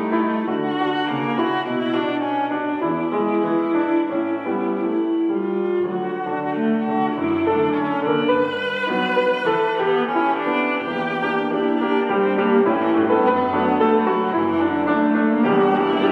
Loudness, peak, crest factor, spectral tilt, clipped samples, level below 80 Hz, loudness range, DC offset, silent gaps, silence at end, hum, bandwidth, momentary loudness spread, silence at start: -20 LUFS; -6 dBFS; 14 dB; -7.5 dB/octave; under 0.1%; -72 dBFS; 3 LU; under 0.1%; none; 0 s; none; 6 kHz; 5 LU; 0 s